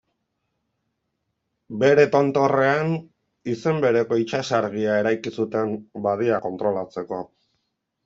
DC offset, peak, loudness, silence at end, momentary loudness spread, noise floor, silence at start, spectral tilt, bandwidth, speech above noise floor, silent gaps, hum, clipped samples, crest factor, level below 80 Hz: under 0.1%; -4 dBFS; -22 LUFS; 0.8 s; 13 LU; -77 dBFS; 1.7 s; -6.5 dB/octave; 7.8 kHz; 55 dB; none; none; under 0.1%; 20 dB; -66 dBFS